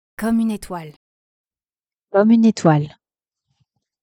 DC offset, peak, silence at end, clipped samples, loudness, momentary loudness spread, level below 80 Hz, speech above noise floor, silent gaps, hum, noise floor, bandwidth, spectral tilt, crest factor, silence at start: under 0.1%; 0 dBFS; 1.15 s; under 0.1%; -17 LUFS; 18 LU; -54 dBFS; over 74 dB; 0.96-1.45 s, 1.93-1.97 s; none; under -90 dBFS; 13 kHz; -7.5 dB/octave; 20 dB; 0.2 s